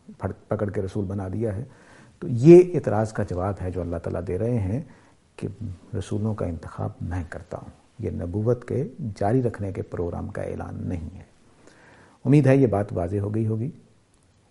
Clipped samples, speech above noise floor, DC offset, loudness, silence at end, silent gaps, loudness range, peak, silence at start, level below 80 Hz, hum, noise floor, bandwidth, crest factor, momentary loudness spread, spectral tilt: under 0.1%; 37 dB; under 0.1%; -24 LUFS; 0.75 s; none; 9 LU; 0 dBFS; 0.1 s; -48 dBFS; none; -60 dBFS; 11 kHz; 24 dB; 16 LU; -9 dB/octave